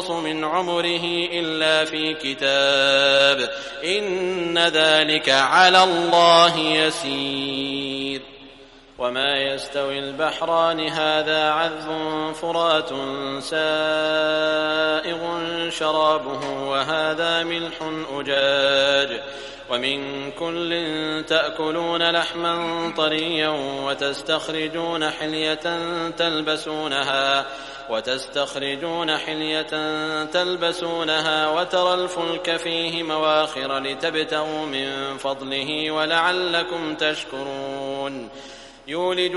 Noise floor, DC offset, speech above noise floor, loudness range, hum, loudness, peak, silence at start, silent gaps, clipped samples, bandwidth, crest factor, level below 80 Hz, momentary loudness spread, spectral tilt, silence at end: -46 dBFS; under 0.1%; 25 dB; 7 LU; none; -21 LUFS; 0 dBFS; 0 s; none; under 0.1%; 11.5 kHz; 22 dB; -56 dBFS; 11 LU; -3 dB/octave; 0 s